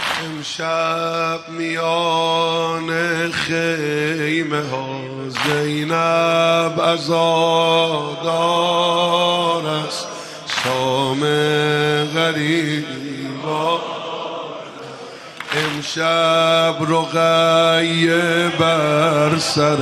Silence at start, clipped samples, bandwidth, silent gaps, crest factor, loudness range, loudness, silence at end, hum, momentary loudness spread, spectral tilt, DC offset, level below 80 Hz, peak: 0 s; under 0.1%; 15 kHz; none; 16 dB; 5 LU; -18 LUFS; 0 s; none; 11 LU; -4.5 dB/octave; under 0.1%; -60 dBFS; -2 dBFS